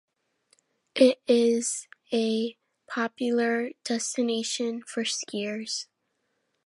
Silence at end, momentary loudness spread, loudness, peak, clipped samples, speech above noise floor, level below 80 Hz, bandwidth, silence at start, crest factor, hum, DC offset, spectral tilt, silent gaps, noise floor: 0.8 s; 12 LU; -27 LUFS; -6 dBFS; under 0.1%; 50 dB; -82 dBFS; 11.5 kHz; 0.95 s; 22 dB; none; under 0.1%; -3 dB/octave; none; -77 dBFS